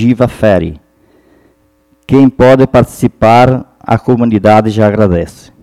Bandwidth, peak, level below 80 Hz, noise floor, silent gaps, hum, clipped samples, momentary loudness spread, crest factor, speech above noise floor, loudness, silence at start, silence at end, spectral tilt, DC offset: 14 kHz; 0 dBFS; -34 dBFS; -52 dBFS; none; none; 2%; 9 LU; 10 dB; 44 dB; -9 LUFS; 0 s; 0.3 s; -8 dB/octave; under 0.1%